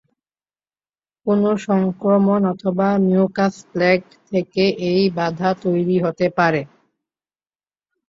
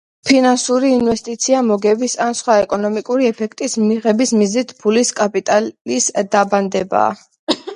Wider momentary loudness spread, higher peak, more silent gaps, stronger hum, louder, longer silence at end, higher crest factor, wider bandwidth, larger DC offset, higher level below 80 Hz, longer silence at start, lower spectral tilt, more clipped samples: about the same, 5 LU vs 5 LU; about the same, -2 dBFS vs 0 dBFS; second, none vs 5.81-5.85 s, 7.39-7.47 s; first, 50 Hz at -65 dBFS vs none; second, -19 LUFS vs -16 LUFS; first, 1.4 s vs 0 s; about the same, 16 dB vs 16 dB; second, 7.6 kHz vs 11 kHz; neither; about the same, -60 dBFS vs -56 dBFS; first, 1.25 s vs 0.25 s; first, -7.5 dB/octave vs -3.5 dB/octave; neither